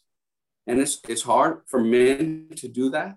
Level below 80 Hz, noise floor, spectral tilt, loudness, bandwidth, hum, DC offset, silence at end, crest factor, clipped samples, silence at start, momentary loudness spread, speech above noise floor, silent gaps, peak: -62 dBFS; -89 dBFS; -4 dB/octave; -22 LUFS; 12.5 kHz; none; under 0.1%; 0 s; 16 dB; under 0.1%; 0.65 s; 13 LU; 67 dB; none; -8 dBFS